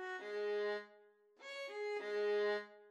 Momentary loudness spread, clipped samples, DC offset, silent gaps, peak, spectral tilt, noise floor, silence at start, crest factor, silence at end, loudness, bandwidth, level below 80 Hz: 13 LU; under 0.1%; under 0.1%; none; -28 dBFS; -3.5 dB/octave; -67 dBFS; 0 s; 12 dB; 0 s; -41 LUFS; 8.8 kHz; under -90 dBFS